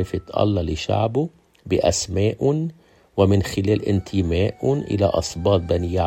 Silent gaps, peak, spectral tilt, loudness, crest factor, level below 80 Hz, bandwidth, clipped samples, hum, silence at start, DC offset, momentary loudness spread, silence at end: none; -2 dBFS; -6 dB/octave; -21 LUFS; 18 dB; -44 dBFS; 14.5 kHz; under 0.1%; none; 0 s; under 0.1%; 6 LU; 0 s